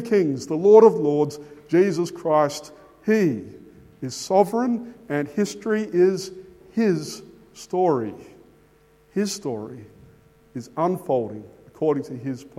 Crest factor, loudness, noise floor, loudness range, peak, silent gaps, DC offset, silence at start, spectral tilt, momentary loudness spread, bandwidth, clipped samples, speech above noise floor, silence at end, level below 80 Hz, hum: 22 dB; -22 LUFS; -56 dBFS; 9 LU; -2 dBFS; none; under 0.1%; 0 s; -6 dB/octave; 16 LU; 14.5 kHz; under 0.1%; 35 dB; 0.15 s; -64 dBFS; none